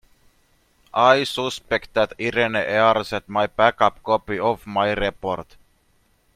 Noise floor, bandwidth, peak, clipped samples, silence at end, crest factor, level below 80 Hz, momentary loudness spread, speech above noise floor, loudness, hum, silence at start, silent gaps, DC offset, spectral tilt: -62 dBFS; 15.5 kHz; -2 dBFS; under 0.1%; 0.95 s; 20 dB; -48 dBFS; 9 LU; 42 dB; -21 LUFS; none; 0.95 s; none; under 0.1%; -4.5 dB/octave